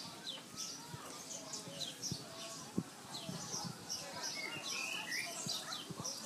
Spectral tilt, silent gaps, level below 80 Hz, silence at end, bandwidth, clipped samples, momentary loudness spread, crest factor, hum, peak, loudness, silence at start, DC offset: -2 dB/octave; none; -78 dBFS; 0 s; 15.5 kHz; under 0.1%; 7 LU; 22 dB; none; -24 dBFS; -43 LUFS; 0 s; under 0.1%